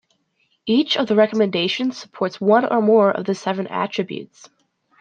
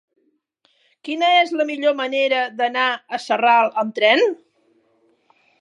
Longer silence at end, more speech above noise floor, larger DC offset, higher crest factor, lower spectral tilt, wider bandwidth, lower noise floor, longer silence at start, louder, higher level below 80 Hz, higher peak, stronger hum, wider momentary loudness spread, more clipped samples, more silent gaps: second, 0.75 s vs 1.25 s; about the same, 48 dB vs 46 dB; neither; about the same, 18 dB vs 18 dB; first, -5.5 dB/octave vs -3 dB/octave; second, 9 kHz vs 11 kHz; about the same, -66 dBFS vs -64 dBFS; second, 0.65 s vs 1.05 s; about the same, -19 LUFS vs -18 LUFS; first, -68 dBFS vs -84 dBFS; about the same, -2 dBFS vs -2 dBFS; neither; about the same, 10 LU vs 9 LU; neither; neither